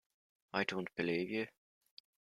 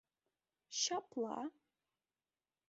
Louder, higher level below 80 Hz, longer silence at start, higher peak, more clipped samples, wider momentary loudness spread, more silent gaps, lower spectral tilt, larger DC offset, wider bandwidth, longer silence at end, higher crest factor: about the same, -39 LUFS vs -41 LUFS; first, -78 dBFS vs -90 dBFS; second, 0.55 s vs 0.7 s; first, -18 dBFS vs -22 dBFS; neither; second, 5 LU vs 9 LU; neither; first, -5.5 dB/octave vs -1 dB/octave; neither; first, 13.5 kHz vs 7.6 kHz; second, 0.8 s vs 1.2 s; about the same, 22 dB vs 24 dB